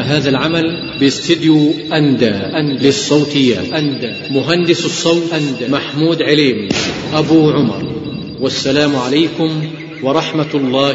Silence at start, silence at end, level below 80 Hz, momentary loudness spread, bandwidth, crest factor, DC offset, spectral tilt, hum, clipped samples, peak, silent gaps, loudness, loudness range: 0 s; 0 s; -48 dBFS; 7 LU; 8 kHz; 14 dB; under 0.1%; -5 dB/octave; none; under 0.1%; 0 dBFS; none; -14 LUFS; 2 LU